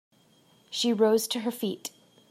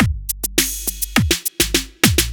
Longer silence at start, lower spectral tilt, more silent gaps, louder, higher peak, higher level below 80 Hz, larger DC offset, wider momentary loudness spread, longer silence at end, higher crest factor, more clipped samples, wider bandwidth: first, 0.7 s vs 0 s; about the same, -3.5 dB/octave vs -3 dB/octave; neither; second, -27 LUFS vs -18 LUFS; second, -10 dBFS vs 0 dBFS; second, -82 dBFS vs -28 dBFS; neither; first, 14 LU vs 5 LU; first, 0.45 s vs 0 s; about the same, 20 dB vs 18 dB; neither; second, 15.5 kHz vs over 20 kHz